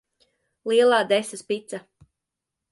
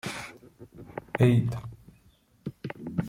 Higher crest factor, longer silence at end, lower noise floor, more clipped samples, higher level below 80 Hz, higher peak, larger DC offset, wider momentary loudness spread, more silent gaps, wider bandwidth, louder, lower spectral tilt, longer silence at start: about the same, 18 dB vs 20 dB; first, 0.9 s vs 0 s; first, -85 dBFS vs -62 dBFS; neither; second, -72 dBFS vs -56 dBFS; about the same, -8 dBFS vs -10 dBFS; neither; about the same, 19 LU vs 21 LU; neither; second, 11.5 kHz vs 14 kHz; first, -22 LUFS vs -28 LUFS; second, -3 dB/octave vs -7.5 dB/octave; first, 0.65 s vs 0.05 s